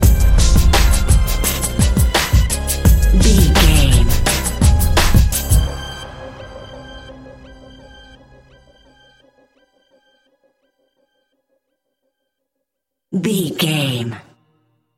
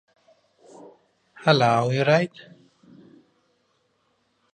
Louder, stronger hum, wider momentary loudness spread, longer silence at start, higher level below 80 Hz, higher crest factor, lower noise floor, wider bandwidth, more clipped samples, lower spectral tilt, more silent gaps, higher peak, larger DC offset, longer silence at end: first, -15 LUFS vs -21 LUFS; neither; first, 22 LU vs 7 LU; second, 0 s vs 1.4 s; first, -18 dBFS vs -70 dBFS; second, 16 dB vs 24 dB; first, -79 dBFS vs -69 dBFS; first, 17 kHz vs 10 kHz; neither; second, -4.5 dB/octave vs -6 dB/octave; neither; about the same, 0 dBFS vs -2 dBFS; neither; second, 0.75 s vs 2.25 s